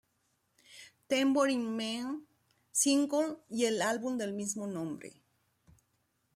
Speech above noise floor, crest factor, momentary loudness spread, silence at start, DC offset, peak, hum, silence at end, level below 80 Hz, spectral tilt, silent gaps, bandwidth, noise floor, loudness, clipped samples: 45 dB; 18 dB; 18 LU; 0.7 s; under 0.1%; -16 dBFS; none; 1.25 s; -80 dBFS; -3 dB/octave; none; 15.5 kHz; -77 dBFS; -32 LUFS; under 0.1%